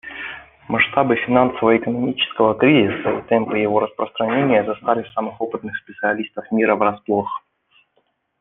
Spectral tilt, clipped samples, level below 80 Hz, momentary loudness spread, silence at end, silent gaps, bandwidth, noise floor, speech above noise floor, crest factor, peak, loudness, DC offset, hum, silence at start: -9 dB/octave; under 0.1%; -56 dBFS; 12 LU; 1 s; none; 4 kHz; -66 dBFS; 48 dB; 18 dB; -2 dBFS; -19 LUFS; under 0.1%; none; 0.05 s